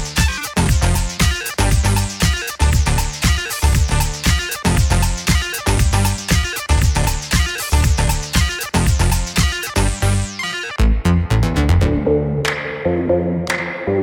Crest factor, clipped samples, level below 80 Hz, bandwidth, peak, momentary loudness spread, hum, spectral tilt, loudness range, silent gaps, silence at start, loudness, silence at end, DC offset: 14 dB; under 0.1%; -20 dBFS; 19 kHz; -2 dBFS; 4 LU; none; -4.5 dB/octave; 1 LU; none; 0 s; -17 LUFS; 0 s; under 0.1%